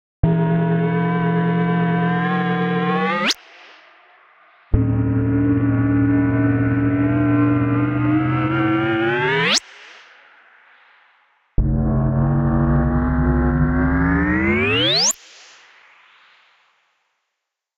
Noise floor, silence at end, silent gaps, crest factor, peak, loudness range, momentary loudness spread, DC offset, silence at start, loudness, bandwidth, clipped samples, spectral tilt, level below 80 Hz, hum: -80 dBFS; 2.6 s; none; 16 dB; -2 dBFS; 4 LU; 3 LU; under 0.1%; 0.25 s; -18 LUFS; 13 kHz; under 0.1%; -5.5 dB/octave; -30 dBFS; none